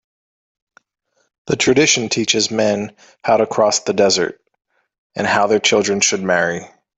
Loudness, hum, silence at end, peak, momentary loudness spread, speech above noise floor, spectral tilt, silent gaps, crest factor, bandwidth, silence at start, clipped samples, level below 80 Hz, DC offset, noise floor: -16 LUFS; none; 0.3 s; 0 dBFS; 10 LU; over 74 dB; -2.5 dB/octave; 4.98-5.10 s; 18 dB; 8.4 kHz; 1.45 s; under 0.1%; -58 dBFS; under 0.1%; under -90 dBFS